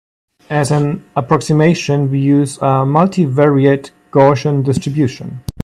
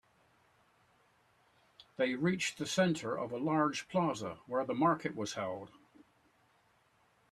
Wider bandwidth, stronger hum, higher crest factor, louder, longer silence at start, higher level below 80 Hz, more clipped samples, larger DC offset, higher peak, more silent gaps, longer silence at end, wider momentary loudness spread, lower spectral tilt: about the same, 12.5 kHz vs 13.5 kHz; neither; second, 14 dB vs 20 dB; first, -14 LUFS vs -34 LUFS; second, 0.5 s vs 2 s; first, -44 dBFS vs -74 dBFS; neither; neither; first, 0 dBFS vs -16 dBFS; neither; second, 0 s vs 1.3 s; about the same, 8 LU vs 10 LU; first, -7 dB/octave vs -5 dB/octave